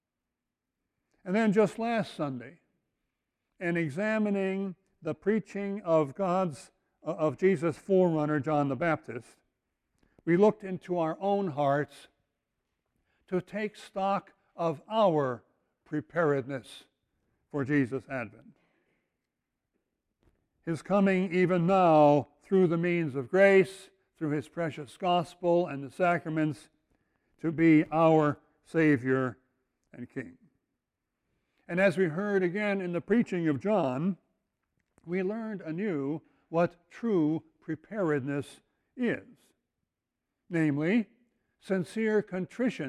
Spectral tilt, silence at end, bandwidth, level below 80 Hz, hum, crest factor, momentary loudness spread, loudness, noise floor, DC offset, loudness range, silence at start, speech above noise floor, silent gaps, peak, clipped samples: -7.5 dB/octave; 0 s; 12 kHz; -70 dBFS; none; 20 dB; 15 LU; -29 LUFS; -87 dBFS; under 0.1%; 8 LU; 1.25 s; 59 dB; none; -10 dBFS; under 0.1%